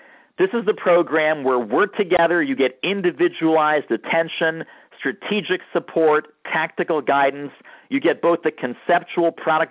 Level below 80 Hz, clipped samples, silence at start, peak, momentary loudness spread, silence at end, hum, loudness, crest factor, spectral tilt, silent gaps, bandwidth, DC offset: -66 dBFS; under 0.1%; 0.4 s; -6 dBFS; 7 LU; 0.05 s; none; -20 LUFS; 14 dB; -9 dB/octave; none; 4 kHz; under 0.1%